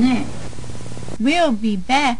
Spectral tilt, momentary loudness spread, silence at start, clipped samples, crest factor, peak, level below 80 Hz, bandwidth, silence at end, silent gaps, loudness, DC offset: -5 dB/octave; 16 LU; 0 s; under 0.1%; 16 dB; -4 dBFS; -40 dBFS; 10 kHz; 0 s; none; -19 LUFS; 6%